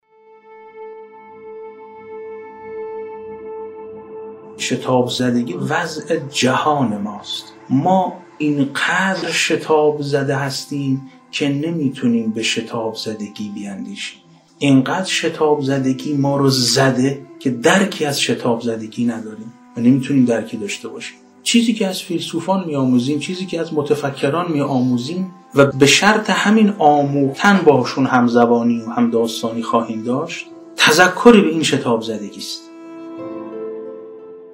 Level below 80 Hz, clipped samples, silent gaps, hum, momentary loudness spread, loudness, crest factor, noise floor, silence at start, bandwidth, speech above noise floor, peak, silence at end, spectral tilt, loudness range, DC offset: -60 dBFS; under 0.1%; none; none; 20 LU; -17 LUFS; 18 dB; -47 dBFS; 0.5 s; 16 kHz; 31 dB; 0 dBFS; 0 s; -4.5 dB/octave; 8 LU; under 0.1%